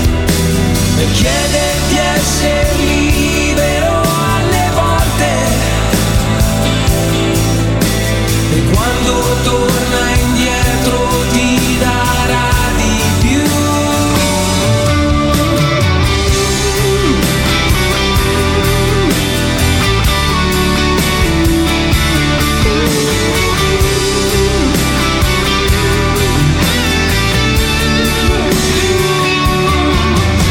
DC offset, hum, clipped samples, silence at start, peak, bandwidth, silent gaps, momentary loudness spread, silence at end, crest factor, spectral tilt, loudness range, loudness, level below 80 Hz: under 0.1%; none; under 0.1%; 0 s; 0 dBFS; 17.5 kHz; none; 1 LU; 0 s; 12 dB; -4.5 dB/octave; 1 LU; -12 LUFS; -18 dBFS